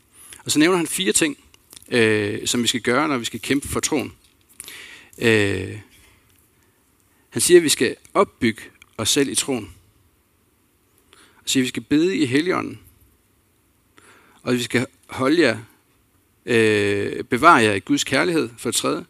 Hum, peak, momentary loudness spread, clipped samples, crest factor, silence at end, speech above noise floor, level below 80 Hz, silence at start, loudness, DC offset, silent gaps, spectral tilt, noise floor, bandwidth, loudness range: none; 0 dBFS; 18 LU; under 0.1%; 22 dB; 0.05 s; 42 dB; -56 dBFS; 0.3 s; -19 LUFS; under 0.1%; none; -3.5 dB/octave; -62 dBFS; 16 kHz; 6 LU